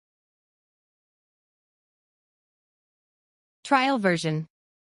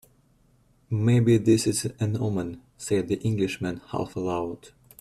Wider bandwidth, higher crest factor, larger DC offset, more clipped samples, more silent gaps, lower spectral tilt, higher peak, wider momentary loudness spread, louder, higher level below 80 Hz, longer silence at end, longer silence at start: second, 11.5 kHz vs 14 kHz; first, 24 dB vs 16 dB; neither; neither; neither; about the same, -5.5 dB/octave vs -6 dB/octave; about the same, -8 dBFS vs -10 dBFS; first, 21 LU vs 12 LU; about the same, -24 LUFS vs -26 LUFS; second, -76 dBFS vs -56 dBFS; about the same, 0.4 s vs 0.35 s; first, 3.65 s vs 0.9 s